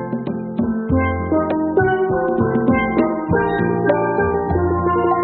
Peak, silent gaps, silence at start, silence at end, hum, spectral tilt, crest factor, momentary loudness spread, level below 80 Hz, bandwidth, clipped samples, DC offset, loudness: -2 dBFS; none; 0 s; 0 s; none; -7.5 dB/octave; 16 dB; 5 LU; -36 dBFS; 4.3 kHz; under 0.1%; under 0.1%; -18 LUFS